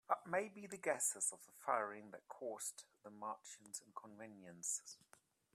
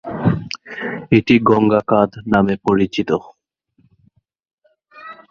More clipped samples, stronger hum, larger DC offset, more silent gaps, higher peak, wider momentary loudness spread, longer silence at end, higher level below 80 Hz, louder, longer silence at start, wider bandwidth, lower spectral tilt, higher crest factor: neither; neither; neither; second, none vs 4.53-4.58 s; second, -22 dBFS vs 0 dBFS; first, 18 LU vs 13 LU; first, 0.6 s vs 0.2 s; second, under -90 dBFS vs -48 dBFS; second, -44 LUFS vs -17 LUFS; about the same, 0.1 s vs 0.05 s; first, 15.5 kHz vs 7 kHz; second, -2 dB/octave vs -7.5 dB/octave; first, 24 dB vs 18 dB